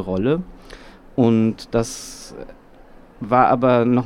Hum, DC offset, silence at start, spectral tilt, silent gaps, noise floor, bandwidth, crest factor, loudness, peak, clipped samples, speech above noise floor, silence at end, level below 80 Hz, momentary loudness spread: none; under 0.1%; 0 s; -6.5 dB/octave; none; -45 dBFS; 14 kHz; 18 dB; -19 LUFS; -2 dBFS; under 0.1%; 26 dB; 0 s; -44 dBFS; 21 LU